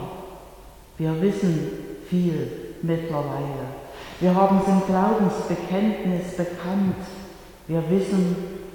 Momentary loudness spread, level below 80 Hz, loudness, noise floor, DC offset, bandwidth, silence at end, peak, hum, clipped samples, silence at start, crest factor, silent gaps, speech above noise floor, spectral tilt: 18 LU; -50 dBFS; -24 LUFS; -45 dBFS; under 0.1%; 18.5 kHz; 0 s; -6 dBFS; none; under 0.1%; 0 s; 18 dB; none; 23 dB; -8 dB/octave